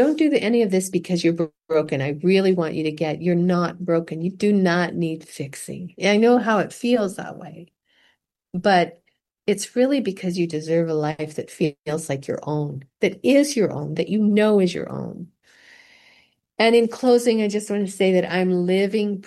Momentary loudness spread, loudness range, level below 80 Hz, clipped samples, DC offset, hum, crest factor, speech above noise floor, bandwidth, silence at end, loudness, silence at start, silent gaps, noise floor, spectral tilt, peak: 13 LU; 3 LU; -66 dBFS; under 0.1%; under 0.1%; none; 16 dB; 45 dB; 12.5 kHz; 0.05 s; -21 LUFS; 0 s; none; -65 dBFS; -6 dB/octave; -4 dBFS